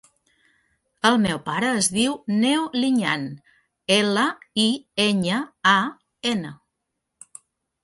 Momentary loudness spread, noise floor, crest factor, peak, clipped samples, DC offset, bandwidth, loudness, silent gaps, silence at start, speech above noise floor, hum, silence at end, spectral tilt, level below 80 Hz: 9 LU; -80 dBFS; 20 dB; -4 dBFS; under 0.1%; under 0.1%; 11.5 kHz; -21 LUFS; none; 1.05 s; 58 dB; none; 1.3 s; -3.5 dB/octave; -62 dBFS